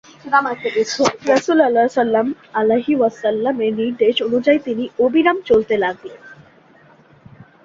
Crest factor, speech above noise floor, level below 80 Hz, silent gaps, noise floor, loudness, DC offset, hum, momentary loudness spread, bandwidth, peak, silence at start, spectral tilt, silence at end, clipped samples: 16 dB; 32 dB; -58 dBFS; none; -49 dBFS; -17 LUFS; under 0.1%; none; 6 LU; 7.8 kHz; -2 dBFS; 0.25 s; -4.5 dB/octave; 0.2 s; under 0.1%